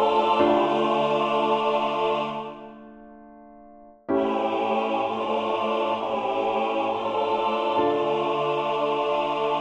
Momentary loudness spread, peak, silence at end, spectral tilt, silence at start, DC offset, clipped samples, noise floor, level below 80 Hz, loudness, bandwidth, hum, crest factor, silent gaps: 5 LU; -8 dBFS; 0 s; -6 dB/octave; 0 s; under 0.1%; under 0.1%; -49 dBFS; -64 dBFS; -24 LUFS; 8.8 kHz; none; 16 dB; none